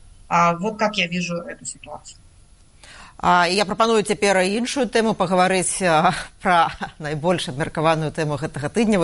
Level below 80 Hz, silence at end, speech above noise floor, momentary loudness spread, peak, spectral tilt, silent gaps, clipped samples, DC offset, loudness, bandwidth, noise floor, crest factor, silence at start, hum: -48 dBFS; 0 s; 30 dB; 11 LU; -4 dBFS; -4.5 dB/octave; none; under 0.1%; under 0.1%; -20 LUFS; 11.5 kHz; -50 dBFS; 16 dB; 0.3 s; none